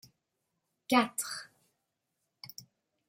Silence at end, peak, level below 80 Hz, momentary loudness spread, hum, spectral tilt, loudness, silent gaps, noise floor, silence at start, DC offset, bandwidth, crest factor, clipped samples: 0.45 s; -12 dBFS; -84 dBFS; 23 LU; none; -2.5 dB/octave; -31 LUFS; none; -84 dBFS; 0.9 s; under 0.1%; 16 kHz; 26 dB; under 0.1%